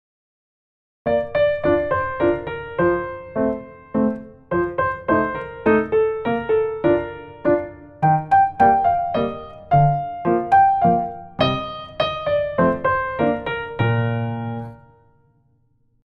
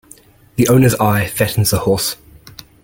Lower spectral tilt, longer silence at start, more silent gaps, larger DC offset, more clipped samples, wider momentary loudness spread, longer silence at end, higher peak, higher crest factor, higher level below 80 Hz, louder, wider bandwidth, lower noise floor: first, -9 dB/octave vs -5 dB/octave; first, 1.05 s vs 0.55 s; neither; neither; neither; about the same, 11 LU vs 10 LU; first, 1.25 s vs 0.35 s; second, -4 dBFS vs 0 dBFS; about the same, 16 dB vs 16 dB; about the same, -46 dBFS vs -42 dBFS; second, -20 LUFS vs -15 LUFS; second, 6.2 kHz vs 17 kHz; first, -61 dBFS vs -45 dBFS